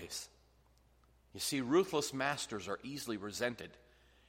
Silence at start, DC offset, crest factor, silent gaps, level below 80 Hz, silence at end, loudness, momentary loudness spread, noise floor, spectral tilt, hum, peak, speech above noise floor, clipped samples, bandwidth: 0 s; under 0.1%; 20 dB; none; -70 dBFS; 0.55 s; -37 LUFS; 18 LU; -68 dBFS; -3.5 dB/octave; none; -18 dBFS; 31 dB; under 0.1%; 16 kHz